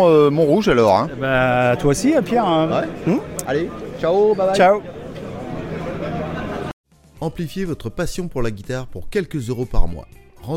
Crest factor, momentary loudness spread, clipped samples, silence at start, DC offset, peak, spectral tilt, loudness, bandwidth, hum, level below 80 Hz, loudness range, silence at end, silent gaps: 18 dB; 15 LU; under 0.1%; 0 s; under 0.1%; -2 dBFS; -6 dB/octave; -19 LUFS; 16.5 kHz; none; -30 dBFS; 10 LU; 0 s; 6.73-6.84 s